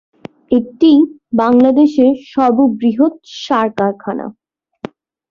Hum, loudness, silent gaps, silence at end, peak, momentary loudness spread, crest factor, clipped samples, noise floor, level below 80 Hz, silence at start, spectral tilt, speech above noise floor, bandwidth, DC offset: none; -13 LUFS; none; 1 s; -2 dBFS; 19 LU; 12 dB; under 0.1%; -32 dBFS; -56 dBFS; 0.5 s; -7 dB/octave; 20 dB; 7 kHz; under 0.1%